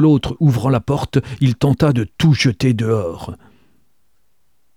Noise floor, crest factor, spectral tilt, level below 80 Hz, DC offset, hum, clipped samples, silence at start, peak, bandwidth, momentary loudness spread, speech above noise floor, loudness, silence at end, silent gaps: -68 dBFS; 14 dB; -7 dB/octave; -42 dBFS; 0.2%; none; under 0.1%; 0 s; -2 dBFS; 14 kHz; 6 LU; 53 dB; -17 LUFS; 1.4 s; none